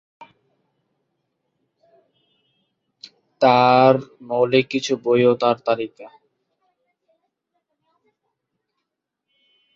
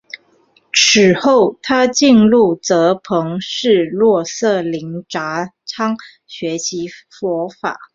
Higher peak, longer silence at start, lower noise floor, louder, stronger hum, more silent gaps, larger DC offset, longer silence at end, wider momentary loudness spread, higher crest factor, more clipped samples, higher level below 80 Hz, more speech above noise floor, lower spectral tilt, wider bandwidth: about the same, -2 dBFS vs 0 dBFS; second, 0.2 s vs 0.75 s; first, -81 dBFS vs -55 dBFS; second, -18 LUFS vs -15 LUFS; neither; neither; neither; first, 3.7 s vs 0.1 s; second, 10 LU vs 16 LU; first, 22 dB vs 16 dB; neither; second, -68 dBFS vs -56 dBFS; first, 63 dB vs 40 dB; first, -5.5 dB/octave vs -4 dB/octave; about the same, 7.6 kHz vs 7.8 kHz